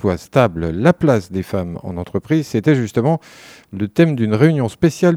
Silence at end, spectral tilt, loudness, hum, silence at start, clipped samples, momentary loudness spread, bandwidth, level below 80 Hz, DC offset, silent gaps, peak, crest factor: 0 s; -7.5 dB/octave; -17 LUFS; none; 0.05 s; under 0.1%; 10 LU; 15 kHz; -44 dBFS; under 0.1%; none; 0 dBFS; 16 dB